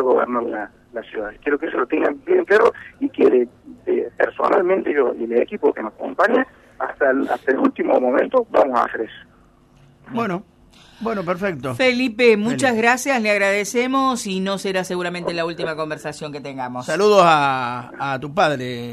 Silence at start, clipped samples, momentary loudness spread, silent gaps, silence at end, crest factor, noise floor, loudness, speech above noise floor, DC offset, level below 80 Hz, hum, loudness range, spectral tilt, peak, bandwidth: 0 s; under 0.1%; 13 LU; none; 0 s; 18 dB; -52 dBFS; -19 LUFS; 33 dB; under 0.1%; -58 dBFS; none; 5 LU; -4.5 dB/octave; -2 dBFS; 13 kHz